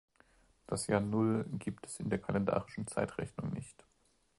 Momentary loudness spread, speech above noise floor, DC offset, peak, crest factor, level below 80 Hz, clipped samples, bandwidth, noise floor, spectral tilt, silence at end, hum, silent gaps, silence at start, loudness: 10 LU; 38 dB; under 0.1%; -16 dBFS; 20 dB; -62 dBFS; under 0.1%; 11.5 kHz; -74 dBFS; -6 dB/octave; 0.65 s; none; none; 0.7 s; -36 LUFS